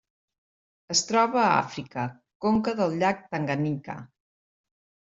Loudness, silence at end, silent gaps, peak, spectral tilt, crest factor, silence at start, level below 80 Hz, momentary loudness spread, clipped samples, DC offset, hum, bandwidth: -26 LUFS; 1.05 s; 2.35-2.40 s; -6 dBFS; -4 dB/octave; 22 dB; 0.9 s; -64 dBFS; 13 LU; under 0.1%; under 0.1%; none; 8.2 kHz